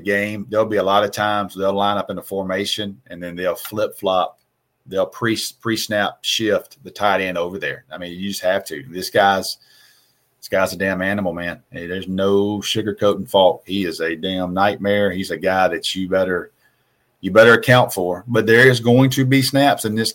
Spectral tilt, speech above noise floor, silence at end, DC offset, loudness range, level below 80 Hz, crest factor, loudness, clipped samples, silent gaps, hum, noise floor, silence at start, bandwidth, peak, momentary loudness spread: -4.5 dB/octave; 46 dB; 0 s; under 0.1%; 7 LU; -58 dBFS; 18 dB; -18 LUFS; under 0.1%; none; none; -64 dBFS; 0 s; 17 kHz; 0 dBFS; 12 LU